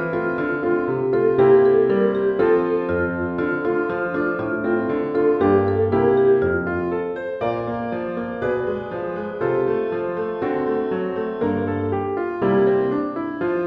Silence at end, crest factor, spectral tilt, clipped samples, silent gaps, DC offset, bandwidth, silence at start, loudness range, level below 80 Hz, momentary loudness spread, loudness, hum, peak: 0 s; 16 dB; -10 dB/octave; under 0.1%; none; under 0.1%; 4.9 kHz; 0 s; 6 LU; -52 dBFS; 9 LU; -21 LUFS; none; -4 dBFS